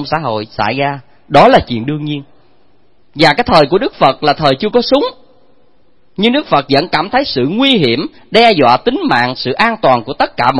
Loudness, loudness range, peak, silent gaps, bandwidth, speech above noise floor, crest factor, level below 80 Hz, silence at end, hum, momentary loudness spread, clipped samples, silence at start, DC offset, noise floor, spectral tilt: -12 LUFS; 3 LU; 0 dBFS; none; 11 kHz; 44 dB; 12 dB; -40 dBFS; 0 s; none; 10 LU; 0.4%; 0 s; 0.9%; -55 dBFS; -6 dB/octave